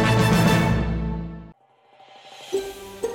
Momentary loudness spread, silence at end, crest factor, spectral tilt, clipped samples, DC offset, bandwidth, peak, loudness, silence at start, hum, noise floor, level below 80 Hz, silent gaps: 19 LU; 0 s; 16 dB; -6 dB/octave; under 0.1%; under 0.1%; 17 kHz; -8 dBFS; -22 LUFS; 0 s; none; -56 dBFS; -36 dBFS; none